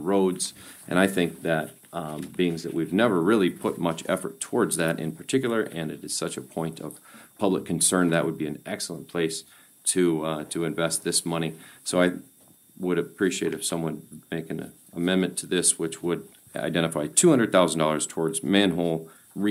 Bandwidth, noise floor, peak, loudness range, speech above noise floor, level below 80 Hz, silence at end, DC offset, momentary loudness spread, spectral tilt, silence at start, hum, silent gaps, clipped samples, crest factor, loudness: 16 kHz; -54 dBFS; -4 dBFS; 5 LU; 29 dB; -64 dBFS; 0 s; under 0.1%; 13 LU; -4 dB/octave; 0 s; none; none; under 0.1%; 22 dB; -26 LUFS